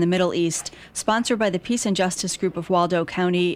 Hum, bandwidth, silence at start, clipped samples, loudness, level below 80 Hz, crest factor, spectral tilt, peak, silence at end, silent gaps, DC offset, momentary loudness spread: none; 15.5 kHz; 0 s; under 0.1%; -23 LUFS; -56 dBFS; 14 dB; -4.5 dB/octave; -8 dBFS; 0 s; none; under 0.1%; 5 LU